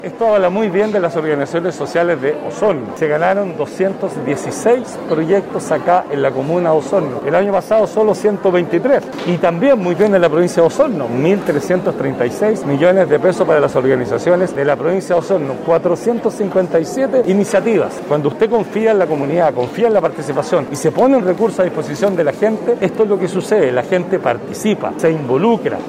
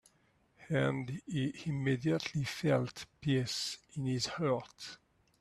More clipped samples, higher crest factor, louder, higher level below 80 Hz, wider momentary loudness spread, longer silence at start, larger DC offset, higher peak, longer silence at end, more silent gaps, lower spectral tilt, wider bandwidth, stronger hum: neither; second, 14 dB vs 20 dB; first, -15 LUFS vs -35 LUFS; first, -54 dBFS vs -66 dBFS; second, 5 LU vs 9 LU; second, 0 s vs 0.6 s; neither; first, 0 dBFS vs -16 dBFS; second, 0 s vs 0.45 s; neither; about the same, -6.5 dB/octave vs -5.5 dB/octave; first, 15.5 kHz vs 13 kHz; neither